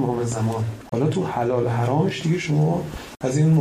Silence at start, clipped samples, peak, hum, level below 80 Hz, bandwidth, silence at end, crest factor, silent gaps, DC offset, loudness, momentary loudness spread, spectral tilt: 0 s; under 0.1%; -8 dBFS; none; -48 dBFS; 12.5 kHz; 0 s; 14 dB; none; under 0.1%; -22 LUFS; 6 LU; -7 dB/octave